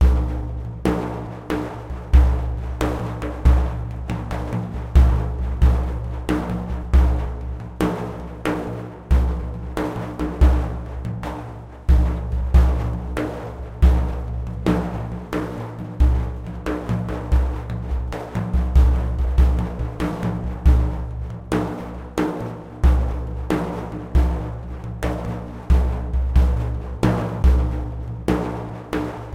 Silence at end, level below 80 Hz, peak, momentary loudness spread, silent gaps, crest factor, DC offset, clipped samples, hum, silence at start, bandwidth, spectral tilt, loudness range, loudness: 0 s; -22 dBFS; -2 dBFS; 11 LU; none; 18 dB; under 0.1%; under 0.1%; none; 0 s; 8.2 kHz; -8 dB/octave; 3 LU; -23 LUFS